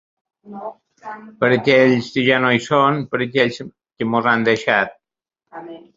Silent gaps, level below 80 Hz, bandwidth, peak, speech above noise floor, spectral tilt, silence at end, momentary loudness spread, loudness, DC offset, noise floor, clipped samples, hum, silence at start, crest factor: none; -60 dBFS; 7.8 kHz; -2 dBFS; 63 dB; -6 dB/octave; 0.2 s; 22 LU; -17 LUFS; under 0.1%; -81 dBFS; under 0.1%; none; 0.45 s; 18 dB